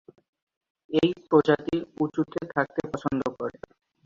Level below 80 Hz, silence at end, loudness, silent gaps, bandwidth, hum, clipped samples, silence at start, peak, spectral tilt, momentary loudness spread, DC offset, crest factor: -60 dBFS; 0.55 s; -27 LUFS; none; 7.4 kHz; none; under 0.1%; 0.9 s; -6 dBFS; -7 dB/octave; 10 LU; under 0.1%; 20 dB